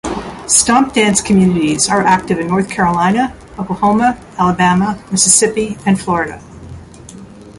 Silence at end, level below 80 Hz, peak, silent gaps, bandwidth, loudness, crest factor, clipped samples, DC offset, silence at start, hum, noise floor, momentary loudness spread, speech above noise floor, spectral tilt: 0 s; -40 dBFS; 0 dBFS; none; 12 kHz; -13 LUFS; 14 dB; under 0.1%; under 0.1%; 0.05 s; none; -35 dBFS; 11 LU; 22 dB; -4 dB/octave